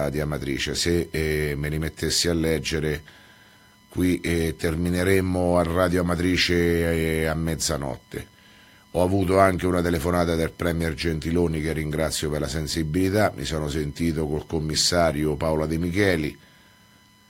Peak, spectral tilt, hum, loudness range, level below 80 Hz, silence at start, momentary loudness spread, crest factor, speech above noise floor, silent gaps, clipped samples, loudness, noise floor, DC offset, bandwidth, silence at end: -2 dBFS; -5 dB/octave; none; 3 LU; -38 dBFS; 0 s; 7 LU; 22 dB; 32 dB; none; under 0.1%; -24 LUFS; -55 dBFS; under 0.1%; 16.5 kHz; 0.95 s